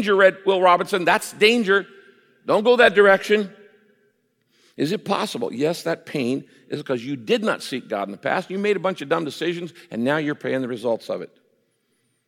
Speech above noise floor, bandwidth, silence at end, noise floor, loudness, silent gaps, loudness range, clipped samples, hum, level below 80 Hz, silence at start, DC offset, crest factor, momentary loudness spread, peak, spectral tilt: 48 dB; 16.5 kHz; 1 s; -69 dBFS; -21 LUFS; none; 8 LU; under 0.1%; none; -70 dBFS; 0 s; under 0.1%; 18 dB; 14 LU; -2 dBFS; -4.5 dB/octave